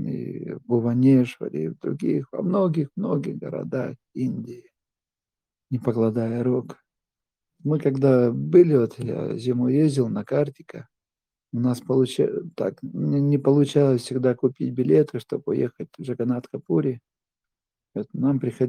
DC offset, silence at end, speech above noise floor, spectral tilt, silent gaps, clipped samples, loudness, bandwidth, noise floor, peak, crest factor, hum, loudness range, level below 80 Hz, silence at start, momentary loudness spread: under 0.1%; 0 s; over 68 dB; -8.5 dB/octave; none; under 0.1%; -23 LUFS; 12 kHz; under -90 dBFS; -4 dBFS; 18 dB; none; 7 LU; -68 dBFS; 0 s; 14 LU